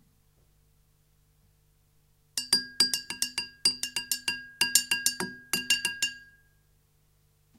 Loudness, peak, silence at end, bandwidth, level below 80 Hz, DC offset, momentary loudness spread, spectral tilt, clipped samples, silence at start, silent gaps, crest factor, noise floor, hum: -27 LUFS; 0 dBFS; 1.35 s; 16.5 kHz; -68 dBFS; under 0.1%; 10 LU; 1 dB/octave; under 0.1%; 2.35 s; none; 32 dB; -66 dBFS; 50 Hz at -70 dBFS